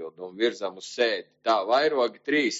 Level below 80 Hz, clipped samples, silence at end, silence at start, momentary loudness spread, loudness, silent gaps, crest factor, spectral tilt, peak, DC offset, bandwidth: -84 dBFS; under 0.1%; 0 s; 0 s; 11 LU; -26 LUFS; none; 16 dB; -0.5 dB/octave; -10 dBFS; under 0.1%; 8 kHz